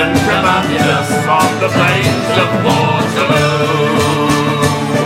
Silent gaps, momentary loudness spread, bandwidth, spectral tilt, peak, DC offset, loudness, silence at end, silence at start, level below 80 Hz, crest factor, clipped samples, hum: none; 2 LU; 16.5 kHz; -5 dB/octave; 0 dBFS; under 0.1%; -12 LUFS; 0 s; 0 s; -40 dBFS; 12 dB; under 0.1%; none